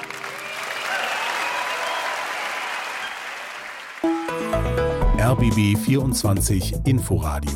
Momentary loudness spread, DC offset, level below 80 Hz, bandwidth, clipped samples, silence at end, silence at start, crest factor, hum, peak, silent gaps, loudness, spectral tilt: 11 LU; under 0.1%; -32 dBFS; 17 kHz; under 0.1%; 0 s; 0 s; 14 dB; none; -8 dBFS; none; -23 LUFS; -5 dB/octave